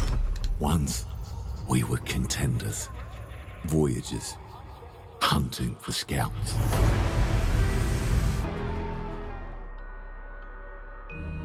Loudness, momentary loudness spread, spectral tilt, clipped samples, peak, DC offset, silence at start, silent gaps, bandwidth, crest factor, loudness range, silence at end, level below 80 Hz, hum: -29 LUFS; 19 LU; -5 dB/octave; under 0.1%; -12 dBFS; under 0.1%; 0 s; none; 16 kHz; 16 dB; 4 LU; 0 s; -32 dBFS; none